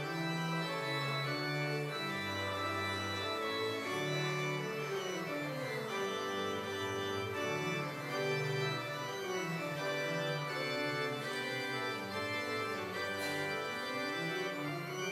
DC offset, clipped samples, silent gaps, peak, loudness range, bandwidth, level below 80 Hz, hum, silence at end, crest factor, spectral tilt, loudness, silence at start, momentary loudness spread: under 0.1%; under 0.1%; none; -24 dBFS; 1 LU; 16 kHz; -82 dBFS; none; 0 s; 14 dB; -4.5 dB/octave; -37 LUFS; 0 s; 3 LU